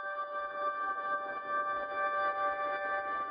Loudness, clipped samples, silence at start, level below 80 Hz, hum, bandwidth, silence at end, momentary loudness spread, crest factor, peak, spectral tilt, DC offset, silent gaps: -34 LUFS; under 0.1%; 0 s; -74 dBFS; none; 5 kHz; 0 s; 4 LU; 12 dB; -22 dBFS; 0 dB/octave; under 0.1%; none